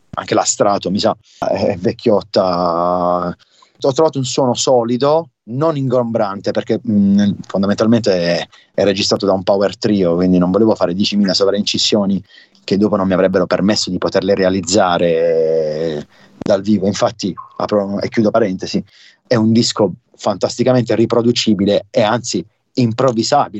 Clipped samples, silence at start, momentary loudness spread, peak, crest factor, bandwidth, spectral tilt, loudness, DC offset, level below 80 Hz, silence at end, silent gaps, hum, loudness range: under 0.1%; 0.15 s; 7 LU; -2 dBFS; 14 dB; 8.4 kHz; -5 dB/octave; -15 LUFS; under 0.1%; -54 dBFS; 0 s; none; none; 2 LU